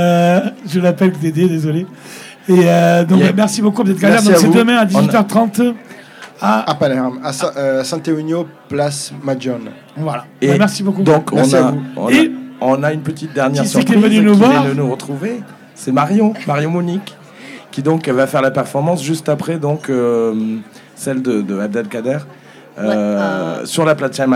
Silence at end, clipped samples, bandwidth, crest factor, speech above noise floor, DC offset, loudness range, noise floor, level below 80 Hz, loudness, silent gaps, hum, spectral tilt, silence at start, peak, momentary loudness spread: 0 s; under 0.1%; 16 kHz; 14 dB; 22 dB; under 0.1%; 7 LU; -36 dBFS; -62 dBFS; -14 LUFS; none; none; -6 dB/octave; 0 s; 0 dBFS; 12 LU